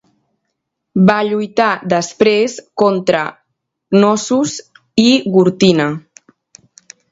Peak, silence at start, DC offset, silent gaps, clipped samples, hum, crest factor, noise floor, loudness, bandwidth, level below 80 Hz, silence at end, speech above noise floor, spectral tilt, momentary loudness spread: 0 dBFS; 0.95 s; under 0.1%; none; under 0.1%; none; 16 dB; -74 dBFS; -14 LUFS; 8 kHz; -56 dBFS; 1.15 s; 61 dB; -5 dB/octave; 9 LU